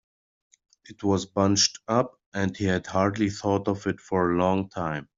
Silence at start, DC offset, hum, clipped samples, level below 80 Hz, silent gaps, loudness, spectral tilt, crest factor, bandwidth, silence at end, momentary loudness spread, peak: 0.9 s; under 0.1%; none; under 0.1%; -60 dBFS; 2.26-2.32 s; -25 LUFS; -4.5 dB/octave; 18 dB; 7.8 kHz; 0.15 s; 8 LU; -8 dBFS